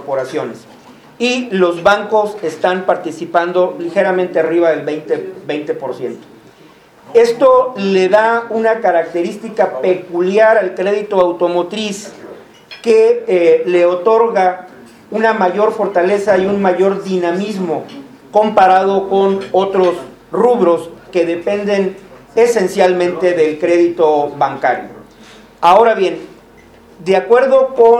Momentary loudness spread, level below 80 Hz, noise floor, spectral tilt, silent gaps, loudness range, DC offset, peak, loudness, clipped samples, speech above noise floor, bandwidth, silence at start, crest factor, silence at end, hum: 11 LU; -56 dBFS; -43 dBFS; -5.5 dB/octave; none; 3 LU; under 0.1%; 0 dBFS; -14 LUFS; under 0.1%; 31 dB; 12.5 kHz; 0 s; 14 dB; 0 s; none